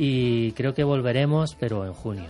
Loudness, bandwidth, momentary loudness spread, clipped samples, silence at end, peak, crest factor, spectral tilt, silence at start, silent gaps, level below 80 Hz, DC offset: -24 LUFS; 11 kHz; 7 LU; under 0.1%; 0 s; -10 dBFS; 14 dB; -7.5 dB/octave; 0 s; none; -50 dBFS; under 0.1%